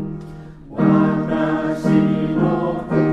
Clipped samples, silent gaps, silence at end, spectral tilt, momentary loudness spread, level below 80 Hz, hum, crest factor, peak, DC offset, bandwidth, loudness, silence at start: under 0.1%; none; 0 s; -9 dB/octave; 17 LU; -44 dBFS; none; 14 dB; -4 dBFS; under 0.1%; 8.8 kHz; -18 LUFS; 0 s